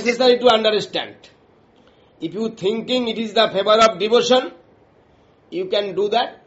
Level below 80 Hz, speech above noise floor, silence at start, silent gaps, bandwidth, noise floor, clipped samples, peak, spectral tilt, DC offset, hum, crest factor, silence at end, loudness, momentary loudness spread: -62 dBFS; 36 dB; 0 s; none; 8 kHz; -54 dBFS; under 0.1%; -2 dBFS; -1.5 dB/octave; under 0.1%; none; 18 dB; 0.1 s; -18 LUFS; 15 LU